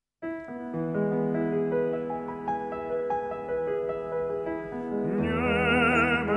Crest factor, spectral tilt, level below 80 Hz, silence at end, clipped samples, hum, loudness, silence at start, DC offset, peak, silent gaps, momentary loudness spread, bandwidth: 16 dB; -7 dB/octave; -54 dBFS; 0 s; under 0.1%; none; -28 LUFS; 0.2 s; under 0.1%; -12 dBFS; none; 11 LU; 10 kHz